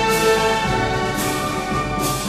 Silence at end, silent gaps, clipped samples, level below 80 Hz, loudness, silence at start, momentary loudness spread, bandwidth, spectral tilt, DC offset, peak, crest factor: 0 s; none; under 0.1%; -36 dBFS; -19 LUFS; 0 s; 6 LU; 14 kHz; -4 dB/octave; under 0.1%; -6 dBFS; 14 dB